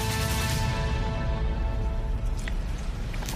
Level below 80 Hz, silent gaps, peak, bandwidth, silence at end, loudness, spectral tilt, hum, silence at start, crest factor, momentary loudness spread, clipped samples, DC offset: -30 dBFS; none; -14 dBFS; 15.5 kHz; 0 s; -30 LUFS; -4.5 dB/octave; none; 0 s; 14 dB; 7 LU; under 0.1%; under 0.1%